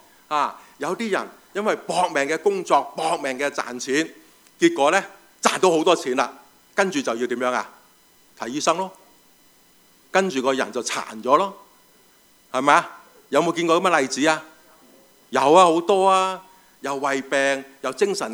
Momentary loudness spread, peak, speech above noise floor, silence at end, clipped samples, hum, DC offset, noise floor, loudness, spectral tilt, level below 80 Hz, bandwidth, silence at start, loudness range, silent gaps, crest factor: 11 LU; 0 dBFS; 35 dB; 0 s; under 0.1%; none; under 0.1%; -56 dBFS; -21 LUFS; -3.5 dB/octave; -74 dBFS; over 20 kHz; 0.3 s; 6 LU; none; 22 dB